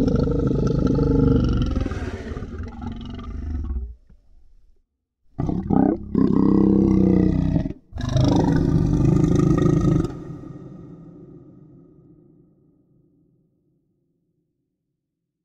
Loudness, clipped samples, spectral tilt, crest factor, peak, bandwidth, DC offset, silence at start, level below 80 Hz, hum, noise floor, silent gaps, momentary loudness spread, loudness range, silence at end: -20 LUFS; under 0.1%; -9 dB/octave; 18 dB; -4 dBFS; 8.2 kHz; under 0.1%; 0 s; -32 dBFS; none; -80 dBFS; none; 18 LU; 13 LU; 4.05 s